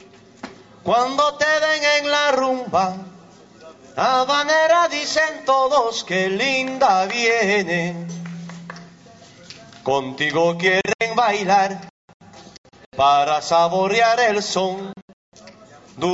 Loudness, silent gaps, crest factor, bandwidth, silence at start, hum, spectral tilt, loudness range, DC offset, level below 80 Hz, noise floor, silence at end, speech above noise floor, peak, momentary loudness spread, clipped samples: -18 LUFS; 10.95-10.99 s, 11.90-12.08 s, 12.14-12.20 s, 12.58-12.64 s, 12.86-12.92 s, 15.02-15.32 s; 16 dB; 8 kHz; 0.45 s; none; -3.5 dB/octave; 4 LU; under 0.1%; -60 dBFS; -46 dBFS; 0 s; 27 dB; -4 dBFS; 17 LU; under 0.1%